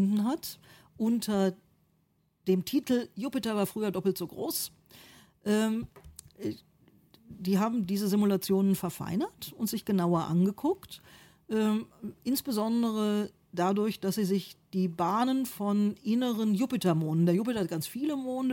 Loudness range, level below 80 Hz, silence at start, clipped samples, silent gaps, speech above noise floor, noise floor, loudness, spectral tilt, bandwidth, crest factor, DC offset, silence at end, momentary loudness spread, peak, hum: 4 LU; -66 dBFS; 0 s; under 0.1%; none; 42 dB; -72 dBFS; -30 LUFS; -6 dB/octave; 17 kHz; 14 dB; under 0.1%; 0 s; 11 LU; -16 dBFS; none